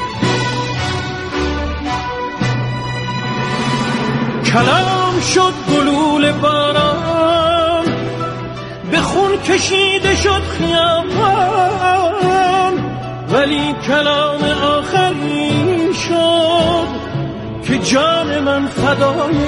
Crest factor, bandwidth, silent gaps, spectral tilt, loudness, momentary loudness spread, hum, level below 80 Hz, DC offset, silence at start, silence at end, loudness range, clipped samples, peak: 14 dB; 11.5 kHz; none; -4.5 dB/octave; -15 LUFS; 8 LU; none; -36 dBFS; under 0.1%; 0 s; 0 s; 4 LU; under 0.1%; 0 dBFS